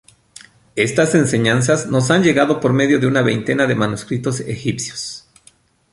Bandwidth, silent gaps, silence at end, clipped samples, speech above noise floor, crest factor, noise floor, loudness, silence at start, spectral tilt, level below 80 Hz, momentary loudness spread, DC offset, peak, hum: 11.5 kHz; none; 0.75 s; under 0.1%; 37 dB; 16 dB; -53 dBFS; -17 LUFS; 0.75 s; -5 dB/octave; -52 dBFS; 10 LU; under 0.1%; -2 dBFS; none